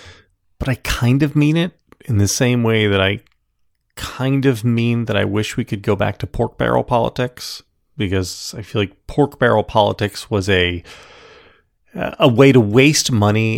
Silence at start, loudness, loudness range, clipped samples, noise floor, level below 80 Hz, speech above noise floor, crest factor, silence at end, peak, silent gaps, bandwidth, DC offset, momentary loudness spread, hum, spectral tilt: 0.05 s; -17 LUFS; 5 LU; under 0.1%; -65 dBFS; -40 dBFS; 49 dB; 18 dB; 0 s; 0 dBFS; none; 17 kHz; under 0.1%; 14 LU; none; -5.5 dB/octave